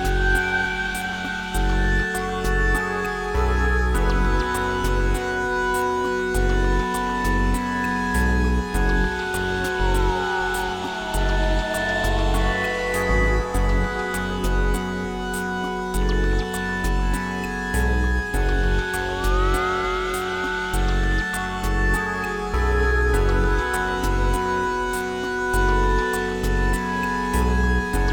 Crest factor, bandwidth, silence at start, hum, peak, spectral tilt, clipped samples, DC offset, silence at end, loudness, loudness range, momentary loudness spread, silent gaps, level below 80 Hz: 14 dB; 18 kHz; 0 s; none; -8 dBFS; -5 dB/octave; under 0.1%; under 0.1%; 0 s; -23 LUFS; 2 LU; 4 LU; none; -24 dBFS